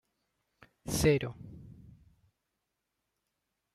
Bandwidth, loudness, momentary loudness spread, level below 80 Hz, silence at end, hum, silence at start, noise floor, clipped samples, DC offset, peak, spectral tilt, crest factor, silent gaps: 16 kHz; -30 LUFS; 24 LU; -54 dBFS; 2.05 s; none; 0.85 s; -85 dBFS; under 0.1%; under 0.1%; -14 dBFS; -5 dB/octave; 24 dB; none